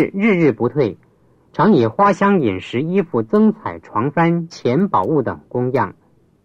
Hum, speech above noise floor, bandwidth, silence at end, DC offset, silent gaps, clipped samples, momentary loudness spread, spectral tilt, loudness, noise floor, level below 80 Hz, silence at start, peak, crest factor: none; 38 dB; 7.8 kHz; 0.55 s; under 0.1%; none; under 0.1%; 9 LU; -8 dB/octave; -17 LUFS; -54 dBFS; -56 dBFS; 0 s; -4 dBFS; 14 dB